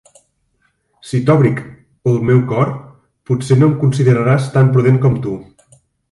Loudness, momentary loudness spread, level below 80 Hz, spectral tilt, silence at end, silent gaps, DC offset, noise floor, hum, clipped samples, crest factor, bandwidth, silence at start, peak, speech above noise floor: -14 LUFS; 10 LU; -48 dBFS; -8.5 dB/octave; 0.7 s; none; under 0.1%; -63 dBFS; none; under 0.1%; 14 dB; 11.5 kHz; 1.05 s; 0 dBFS; 50 dB